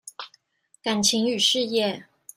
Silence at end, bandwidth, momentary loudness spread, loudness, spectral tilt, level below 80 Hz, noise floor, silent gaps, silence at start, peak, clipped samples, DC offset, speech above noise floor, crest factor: 0.35 s; 16 kHz; 20 LU; -22 LUFS; -2.5 dB/octave; -66 dBFS; -61 dBFS; none; 0.05 s; -6 dBFS; under 0.1%; under 0.1%; 38 dB; 20 dB